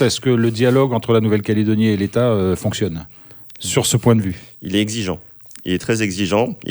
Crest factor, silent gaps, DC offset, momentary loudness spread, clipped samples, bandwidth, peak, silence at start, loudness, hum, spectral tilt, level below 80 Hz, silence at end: 16 dB; none; under 0.1%; 16 LU; under 0.1%; over 20 kHz; 0 dBFS; 0 s; -18 LUFS; none; -5.5 dB/octave; -48 dBFS; 0 s